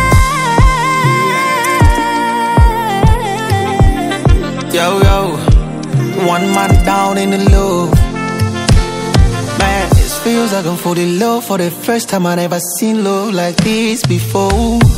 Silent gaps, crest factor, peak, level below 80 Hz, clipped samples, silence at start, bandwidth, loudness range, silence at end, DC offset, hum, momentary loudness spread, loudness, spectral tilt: none; 12 dB; 0 dBFS; -16 dBFS; 0.5%; 0 s; 16.5 kHz; 2 LU; 0 s; under 0.1%; none; 5 LU; -12 LUFS; -5.5 dB/octave